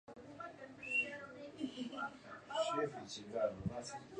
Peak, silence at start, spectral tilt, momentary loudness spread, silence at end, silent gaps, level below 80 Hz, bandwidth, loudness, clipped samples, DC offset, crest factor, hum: -24 dBFS; 0.1 s; -4.5 dB/octave; 14 LU; 0 s; none; -68 dBFS; 10 kHz; -42 LUFS; under 0.1%; under 0.1%; 20 dB; none